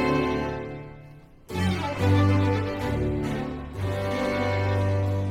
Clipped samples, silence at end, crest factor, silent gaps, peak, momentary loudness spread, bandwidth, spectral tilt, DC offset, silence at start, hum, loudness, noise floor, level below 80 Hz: under 0.1%; 0 s; 16 dB; none; -10 dBFS; 13 LU; 12 kHz; -7.5 dB/octave; under 0.1%; 0 s; none; -26 LUFS; -47 dBFS; -44 dBFS